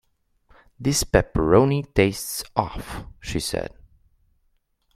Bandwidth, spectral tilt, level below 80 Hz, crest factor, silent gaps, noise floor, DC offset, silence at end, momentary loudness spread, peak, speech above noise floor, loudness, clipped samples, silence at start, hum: 16 kHz; -5 dB/octave; -38 dBFS; 24 dB; none; -67 dBFS; under 0.1%; 1.25 s; 17 LU; 0 dBFS; 45 dB; -22 LUFS; under 0.1%; 0.8 s; none